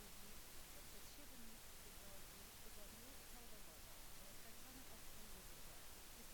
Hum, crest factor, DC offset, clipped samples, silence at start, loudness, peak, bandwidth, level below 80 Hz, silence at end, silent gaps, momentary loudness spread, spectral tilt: none; 12 dB; under 0.1%; under 0.1%; 0 s; -58 LUFS; -44 dBFS; over 20 kHz; -64 dBFS; 0 s; none; 1 LU; -2 dB/octave